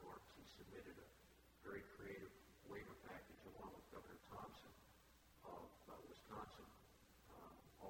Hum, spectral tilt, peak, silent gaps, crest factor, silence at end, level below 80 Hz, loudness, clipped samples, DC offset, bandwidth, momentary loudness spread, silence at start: none; -5 dB/octave; -40 dBFS; none; 20 dB; 0 s; -74 dBFS; -60 LUFS; under 0.1%; under 0.1%; 16.5 kHz; 10 LU; 0 s